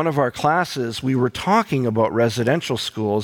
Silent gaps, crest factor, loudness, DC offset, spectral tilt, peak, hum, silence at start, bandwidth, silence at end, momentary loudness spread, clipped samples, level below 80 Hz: none; 14 dB; -20 LUFS; under 0.1%; -5.5 dB/octave; -6 dBFS; none; 0 s; 18 kHz; 0 s; 5 LU; under 0.1%; -54 dBFS